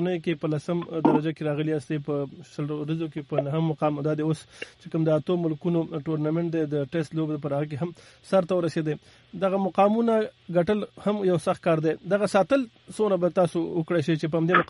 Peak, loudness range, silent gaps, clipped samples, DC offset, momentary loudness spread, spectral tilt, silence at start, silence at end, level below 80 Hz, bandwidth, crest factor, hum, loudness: -4 dBFS; 4 LU; none; under 0.1%; under 0.1%; 8 LU; -7.5 dB/octave; 0 s; 0.05 s; -64 dBFS; 11.5 kHz; 20 dB; none; -26 LUFS